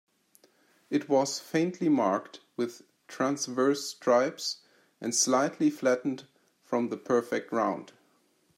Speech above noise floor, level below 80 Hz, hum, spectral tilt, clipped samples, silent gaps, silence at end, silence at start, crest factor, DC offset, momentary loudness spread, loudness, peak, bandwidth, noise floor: 40 dB; -82 dBFS; none; -3.5 dB/octave; under 0.1%; none; 0.7 s; 0.9 s; 18 dB; under 0.1%; 10 LU; -29 LUFS; -12 dBFS; 16 kHz; -68 dBFS